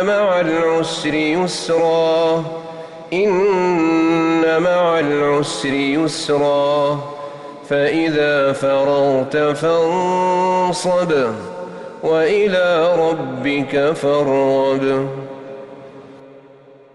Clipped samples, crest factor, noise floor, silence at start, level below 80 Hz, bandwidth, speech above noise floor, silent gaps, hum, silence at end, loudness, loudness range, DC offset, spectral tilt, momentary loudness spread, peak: under 0.1%; 10 dB; -44 dBFS; 0 s; -56 dBFS; 11.5 kHz; 28 dB; none; none; 0.55 s; -16 LUFS; 2 LU; under 0.1%; -5.5 dB/octave; 14 LU; -6 dBFS